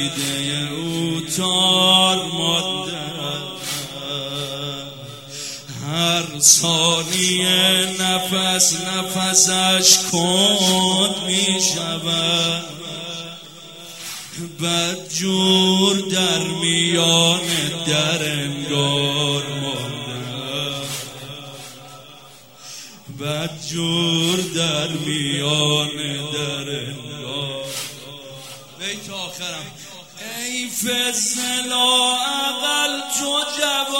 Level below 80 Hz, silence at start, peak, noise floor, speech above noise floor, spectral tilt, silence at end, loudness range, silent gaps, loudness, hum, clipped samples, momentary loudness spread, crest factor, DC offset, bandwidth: -60 dBFS; 0 s; 0 dBFS; -44 dBFS; 25 dB; -2.5 dB/octave; 0 s; 13 LU; none; -18 LUFS; none; under 0.1%; 18 LU; 20 dB; 0.2%; 16 kHz